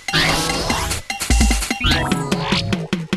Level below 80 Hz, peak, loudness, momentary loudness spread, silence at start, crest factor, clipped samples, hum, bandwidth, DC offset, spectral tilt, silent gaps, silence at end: -24 dBFS; -2 dBFS; -18 LUFS; 6 LU; 0 s; 16 dB; under 0.1%; none; 13 kHz; under 0.1%; -3.5 dB/octave; none; 0 s